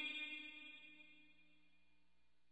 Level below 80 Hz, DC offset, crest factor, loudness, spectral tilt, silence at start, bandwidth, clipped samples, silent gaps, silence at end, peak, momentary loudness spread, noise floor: under -90 dBFS; under 0.1%; 20 dB; -50 LUFS; -1.5 dB/octave; 0 s; 8.2 kHz; under 0.1%; none; 0.9 s; -36 dBFS; 19 LU; -84 dBFS